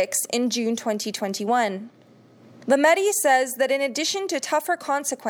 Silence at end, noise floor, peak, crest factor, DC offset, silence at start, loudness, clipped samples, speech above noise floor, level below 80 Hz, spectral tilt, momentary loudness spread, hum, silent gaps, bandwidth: 0 s; -52 dBFS; -6 dBFS; 18 dB; under 0.1%; 0 s; -22 LUFS; under 0.1%; 29 dB; -86 dBFS; -2 dB/octave; 9 LU; none; none; over 20 kHz